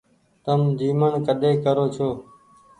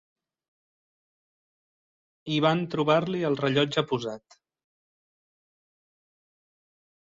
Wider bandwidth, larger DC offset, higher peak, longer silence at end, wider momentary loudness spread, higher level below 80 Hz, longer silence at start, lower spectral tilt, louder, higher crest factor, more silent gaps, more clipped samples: first, 10 kHz vs 7.8 kHz; neither; about the same, -8 dBFS vs -8 dBFS; second, 0.55 s vs 2.85 s; second, 7 LU vs 12 LU; first, -60 dBFS vs -70 dBFS; second, 0.45 s vs 2.25 s; first, -8.5 dB/octave vs -6.5 dB/octave; first, -22 LUFS vs -26 LUFS; second, 16 dB vs 22 dB; neither; neither